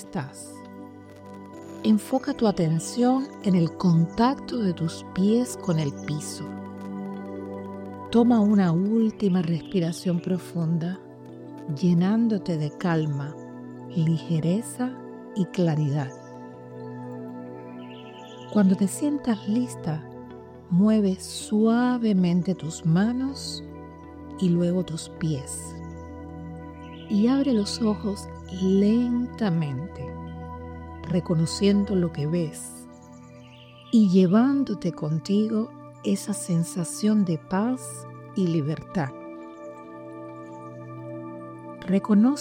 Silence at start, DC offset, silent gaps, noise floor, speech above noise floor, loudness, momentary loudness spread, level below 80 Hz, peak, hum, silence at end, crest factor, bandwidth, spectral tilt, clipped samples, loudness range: 0 s; under 0.1%; none; -47 dBFS; 24 dB; -25 LUFS; 19 LU; -58 dBFS; -8 dBFS; none; 0 s; 18 dB; 15.5 kHz; -7 dB/octave; under 0.1%; 6 LU